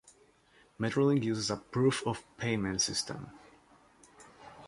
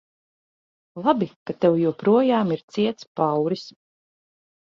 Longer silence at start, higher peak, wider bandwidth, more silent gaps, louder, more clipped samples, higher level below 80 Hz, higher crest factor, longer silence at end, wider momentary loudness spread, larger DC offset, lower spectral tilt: second, 0.8 s vs 0.95 s; second, -16 dBFS vs -6 dBFS; first, 11.5 kHz vs 7.6 kHz; second, none vs 1.36-1.46 s, 2.63-2.68 s, 3.07-3.15 s; second, -32 LUFS vs -22 LUFS; neither; first, -62 dBFS vs -68 dBFS; about the same, 18 dB vs 18 dB; second, 0 s vs 1 s; first, 17 LU vs 11 LU; neither; second, -4.5 dB/octave vs -7.5 dB/octave